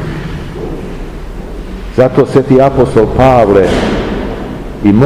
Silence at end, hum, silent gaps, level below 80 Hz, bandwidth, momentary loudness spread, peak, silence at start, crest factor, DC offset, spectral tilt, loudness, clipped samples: 0 s; none; none; -24 dBFS; 14.5 kHz; 18 LU; 0 dBFS; 0 s; 10 dB; under 0.1%; -7.5 dB/octave; -10 LUFS; 3%